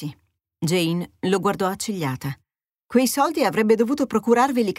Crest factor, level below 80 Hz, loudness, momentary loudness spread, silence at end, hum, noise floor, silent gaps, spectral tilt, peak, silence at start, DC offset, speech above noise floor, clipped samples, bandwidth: 16 dB; -60 dBFS; -21 LUFS; 10 LU; 0.05 s; none; -52 dBFS; none; -5 dB/octave; -6 dBFS; 0 s; under 0.1%; 31 dB; under 0.1%; 16 kHz